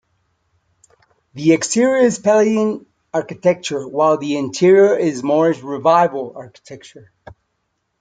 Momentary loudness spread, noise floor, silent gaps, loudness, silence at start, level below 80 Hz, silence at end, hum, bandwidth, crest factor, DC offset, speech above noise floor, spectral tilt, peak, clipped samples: 18 LU; -71 dBFS; none; -16 LUFS; 1.35 s; -62 dBFS; 1.15 s; none; 9.4 kHz; 16 dB; under 0.1%; 55 dB; -5 dB/octave; -2 dBFS; under 0.1%